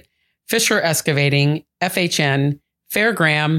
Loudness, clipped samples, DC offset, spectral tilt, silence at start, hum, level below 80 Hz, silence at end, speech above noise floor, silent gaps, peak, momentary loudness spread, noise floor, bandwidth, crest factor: -18 LUFS; under 0.1%; under 0.1%; -4 dB/octave; 0.5 s; none; -58 dBFS; 0 s; 31 dB; none; -2 dBFS; 7 LU; -48 dBFS; 17 kHz; 16 dB